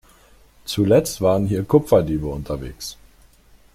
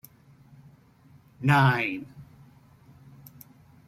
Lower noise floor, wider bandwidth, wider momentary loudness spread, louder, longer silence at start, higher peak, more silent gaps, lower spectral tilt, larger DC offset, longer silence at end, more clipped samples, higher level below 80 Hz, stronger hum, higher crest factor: second, -51 dBFS vs -57 dBFS; about the same, 16 kHz vs 15.5 kHz; second, 16 LU vs 28 LU; first, -20 LUFS vs -24 LUFS; second, 0.65 s vs 1.4 s; first, -2 dBFS vs -6 dBFS; neither; about the same, -6.5 dB/octave vs -7 dB/octave; neither; second, 0.8 s vs 1.65 s; neither; first, -42 dBFS vs -62 dBFS; neither; second, 18 dB vs 24 dB